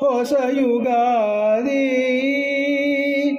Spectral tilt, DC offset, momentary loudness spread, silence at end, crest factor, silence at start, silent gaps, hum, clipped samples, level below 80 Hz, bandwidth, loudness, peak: -4.5 dB/octave; under 0.1%; 1 LU; 0 s; 10 dB; 0 s; none; none; under 0.1%; -68 dBFS; 15.5 kHz; -19 LUFS; -8 dBFS